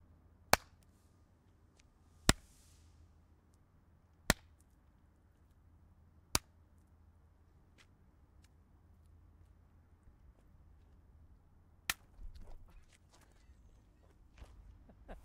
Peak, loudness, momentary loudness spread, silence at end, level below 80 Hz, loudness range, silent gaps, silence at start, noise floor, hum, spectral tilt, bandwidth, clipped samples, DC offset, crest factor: -10 dBFS; -36 LUFS; 30 LU; 0.1 s; -56 dBFS; 10 LU; none; 0.5 s; -68 dBFS; none; -2.5 dB/octave; 15.5 kHz; under 0.1%; under 0.1%; 36 dB